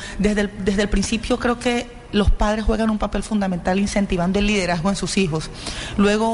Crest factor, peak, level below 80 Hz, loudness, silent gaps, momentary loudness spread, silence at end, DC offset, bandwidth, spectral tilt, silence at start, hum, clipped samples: 14 dB; -6 dBFS; -28 dBFS; -21 LUFS; none; 5 LU; 0 s; under 0.1%; 11.5 kHz; -5 dB/octave; 0 s; none; under 0.1%